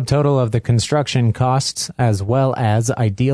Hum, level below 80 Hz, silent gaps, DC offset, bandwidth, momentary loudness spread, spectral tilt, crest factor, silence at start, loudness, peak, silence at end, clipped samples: none; -44 dBFS; none; under 0.1%; 11 kHz; 3 LU; -6 dB/octave; 12 dB; 0 s; -17 LUFS; -4 dBFS; 0 s; under 0.1%